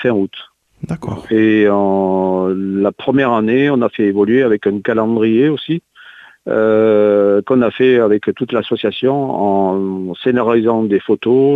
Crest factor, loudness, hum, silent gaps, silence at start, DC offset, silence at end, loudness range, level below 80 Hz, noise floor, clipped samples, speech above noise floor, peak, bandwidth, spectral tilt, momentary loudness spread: 12 dB; -14 LUFS; none; none; 0 s; under 0.1%; 0 s; 2 LU; -54 dBFS; -40 dBFS; under 0.1%; 27 dB; -2 dBFS; 4.5 kHz; -8.5 dB/octave; 9 LU